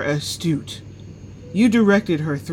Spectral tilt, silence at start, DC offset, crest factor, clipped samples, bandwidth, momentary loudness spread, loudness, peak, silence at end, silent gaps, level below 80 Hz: -6 dB/octave; 0 s; under 0.1%; 16 dB; under 0.1%; 16.5 kHz; 24 LU; -19 LUFS; -4 dBFS; 0 s; none; -50 dBFS